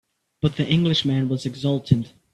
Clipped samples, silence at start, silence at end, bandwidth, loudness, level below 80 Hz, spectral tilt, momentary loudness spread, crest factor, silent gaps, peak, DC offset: under 0.1%; 0.45 s; 0.25 s; 10.5 kHz; -22 LUFS; -50 dBFS; -7 dB/octave; 6 LU; 20 dB; none; -2 dBFS; under 0.1%